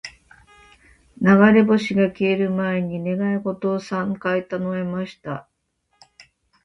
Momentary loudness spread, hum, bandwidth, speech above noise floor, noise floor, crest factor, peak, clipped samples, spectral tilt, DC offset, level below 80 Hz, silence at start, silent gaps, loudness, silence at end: 16 LU; none; 7.8 kHz; 50 dB; -70 dBFS; 18 dB; -2 dBFS; under 0.1%; -7.5 dB/octave; under 0.1%; -58 dBFS; 0.05 s; none; -20 LUFS; 0.45 s